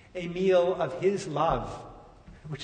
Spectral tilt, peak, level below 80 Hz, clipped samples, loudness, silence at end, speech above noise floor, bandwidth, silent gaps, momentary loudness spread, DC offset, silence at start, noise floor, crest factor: -6 dB/octave; -12 dBFS; -50 dBFS; under 0.1%; -27 LUFS; 0 s; 23 dB; 9.4 kHz; none; 18 LU; under 0.1%; 0.15 s; -50 dBFS; 16 dB